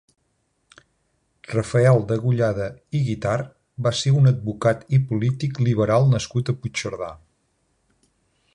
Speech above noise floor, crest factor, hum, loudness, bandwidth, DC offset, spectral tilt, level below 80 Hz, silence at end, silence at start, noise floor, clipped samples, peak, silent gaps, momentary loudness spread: 49 dB; 18 dB; none; -21 LUFS; 10.5 kHz; under 0.1%; -6.5 dB/octave; -50 dBFS; 1.4 s; 1.5 s; -70 dBFS; under 0.1%; -6 dBFS; none; 10 LU